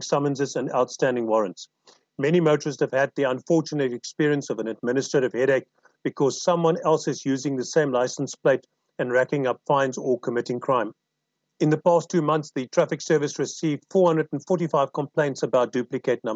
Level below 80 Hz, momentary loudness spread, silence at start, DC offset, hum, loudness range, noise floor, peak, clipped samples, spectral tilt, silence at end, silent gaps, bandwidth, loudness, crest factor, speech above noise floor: -88 dBFS; 6 LU; 0 s; under 0.1%; none; 1 LU; -79 dBFS; -8 dBFS; under 0.1%; -5.5 dB/octave; 0 s; none; 8.2 kHz; -24 LUFS; 16 dB; 56 dB